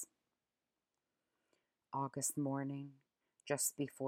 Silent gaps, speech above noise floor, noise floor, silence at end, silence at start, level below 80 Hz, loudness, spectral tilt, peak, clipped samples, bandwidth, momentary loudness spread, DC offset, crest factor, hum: none; over 49 dB; under -90 dBFS; 0 s; 0 s; -90 dBFS; -40 LUFS; -4 dB/octave; -24 dBFS; under 0.1%; 16.5 kHz; 15 LU; under 0.1%; 20 dB; none